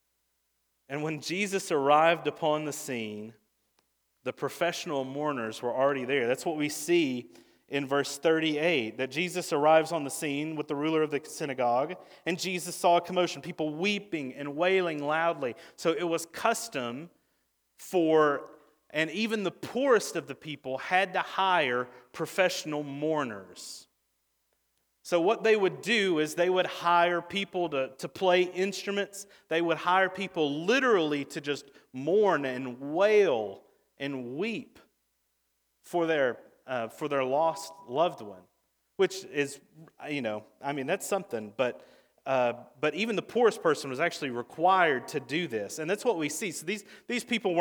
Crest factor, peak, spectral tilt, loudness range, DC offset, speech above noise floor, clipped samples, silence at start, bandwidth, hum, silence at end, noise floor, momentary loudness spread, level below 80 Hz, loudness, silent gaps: 20 dB; -8 dBFS; -4 dB/octave; 5 LU; under 0.1%; 48 dB; under 0.1%; 0.9 s; over 20 kHz; none; 0 s; -77 dBFS; 12 LU; -80 dBFS; -29 LUFS; none